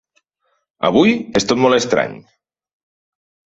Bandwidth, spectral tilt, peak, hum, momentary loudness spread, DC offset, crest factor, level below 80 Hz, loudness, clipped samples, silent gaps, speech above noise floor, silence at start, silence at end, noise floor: 8 kHz; -4.5 dB/octave; -2 dBFS; none; 6 LU; under 0.1%; 18 dB; -52 dBFS; -16 LUFS; under 0.1%; none; 53 dB; 0.8 s; 1.3 s; -68 dBFS